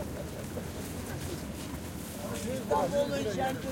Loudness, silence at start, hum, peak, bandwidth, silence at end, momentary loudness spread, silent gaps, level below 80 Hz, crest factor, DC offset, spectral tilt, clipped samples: -34 LUFS; 0 s; none; -16 dBFS; 16.5 kHz; 0 s; 10 LU; none; -50 dBFS; 18 dB; under 0.1%; -5 dB/octave; under 0.1%